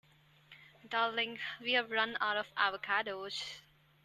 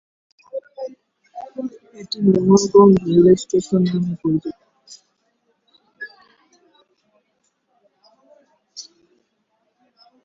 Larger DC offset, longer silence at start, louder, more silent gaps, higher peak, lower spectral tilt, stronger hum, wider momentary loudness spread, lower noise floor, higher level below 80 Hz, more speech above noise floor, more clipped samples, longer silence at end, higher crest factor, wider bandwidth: neither; about the same, 0.5 s vs 0.55 s; second, -34 LUFS vs -16 LUFS; neither; second, -16 dBFS vs -2 dBFS; second, -2.5 dB/octave vs -7 dB/octave; neither; second, 9 LU vs 26 LU; second, -63 dBFS vs -69 dBFS; second, -78 dBFS vs -56 dBFS; second, 28 dB vs 54 dB; neither; second, 0.45 s vs 1.4 s; about the same, 22 dB vs 20 dB; first, 13.5 kHz vs 7.8 kHz